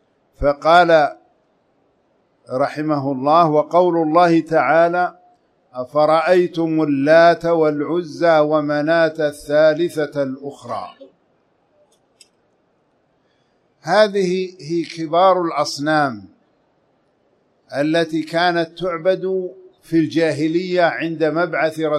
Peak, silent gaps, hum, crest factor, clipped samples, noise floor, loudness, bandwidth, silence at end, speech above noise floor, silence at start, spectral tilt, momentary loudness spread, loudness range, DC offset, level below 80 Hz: 0 dBFS; none; none; 18 dB; under 0.1%; -62 dBFS; -17 LUFS; 12.5 kHz; 0 s; 46 dB; 0.4 s; -6 dB/octave; 11 LU; 7 LU; under 0.1%; -48 dBFS